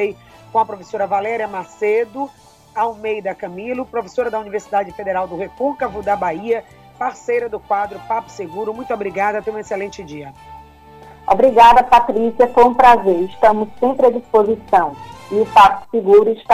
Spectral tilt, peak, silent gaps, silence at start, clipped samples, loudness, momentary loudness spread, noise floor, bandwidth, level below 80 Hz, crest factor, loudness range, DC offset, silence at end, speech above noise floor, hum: -5.5 dB/octave; 0 dBFS; none; 0 s; under 0.1%; -16 LUFS; 15 LU; -41 dBFS; 15.5 kHz; -46 dBFS; 16 dB; 10 LU; under 0.1%; 0 s; 25 dB; none